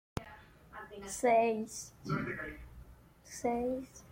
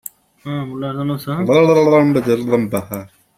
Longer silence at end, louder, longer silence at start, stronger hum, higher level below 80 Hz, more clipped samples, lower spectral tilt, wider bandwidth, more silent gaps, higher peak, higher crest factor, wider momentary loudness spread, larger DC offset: second, 0 s vs 0.3 s; second, -35 LUFS vs -16 LUFS; second, 0.15 s vs 0.45 s; neither; about the same, -58 dBFS vs -54 dBFS; neither; second, -5 dB/octave vs -7 dB/octave; about the same, 16.5 kHz vs 16.5 kHz; neither; second, -18 dBFS vs -2 dBFS; about the same, 18 dB vs 14 dB; first, 22 LU vs 18 LU; neither